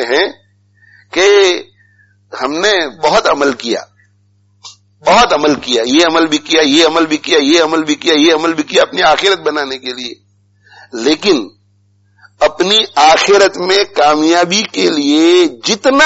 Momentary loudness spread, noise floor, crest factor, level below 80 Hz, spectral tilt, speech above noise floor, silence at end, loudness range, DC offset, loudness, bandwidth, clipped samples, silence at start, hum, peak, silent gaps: 11 LU; -53 dBFS; 12 dB; -48 dBFS; -2.5 dB/octave; 42 dB; 0 s; 6 LU; under 0.1%; -11 LUFS; 8.2 kHz; under 0.1%; 0 s; 50 Hz at -50 dBFS; 0 dBFS; none